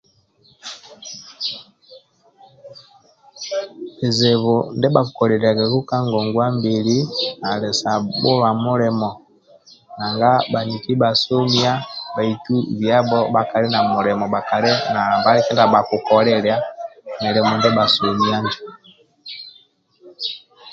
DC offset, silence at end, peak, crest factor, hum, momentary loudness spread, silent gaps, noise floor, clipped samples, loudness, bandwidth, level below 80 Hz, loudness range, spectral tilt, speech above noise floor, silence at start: under 0.1%; 0 s; 0 dBFS; 18 dB; none; 18 LU; none; -56 dBFS; under 0.1%; -18 LUFS; 7.8 kHz; -58 dBFS; 6 LU; -5.5 dB/octave; 39 dB; 0.65 s